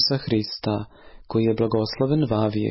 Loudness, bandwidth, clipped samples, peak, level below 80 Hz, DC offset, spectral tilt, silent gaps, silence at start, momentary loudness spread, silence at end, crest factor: -23 LUFS; 5.8 kHz; under 0.1%; -10 dBFS; -50 dBFS; under 0.1%; -9.5 dB/octave; none; 0 s; 6 LU; 0 s; 14 dB